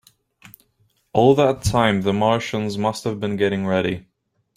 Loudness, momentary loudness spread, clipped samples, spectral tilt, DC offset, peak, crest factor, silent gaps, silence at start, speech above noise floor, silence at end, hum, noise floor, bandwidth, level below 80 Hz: -20 LUFS; 9 LU; under 0.1%; -6 dB/octave; under 0.1%; -2 dBFS; 20 dB; none; 1.15 s; 45 dB; 0.55 s; none; -64 dBFS; 16 kHz; -44 dBFS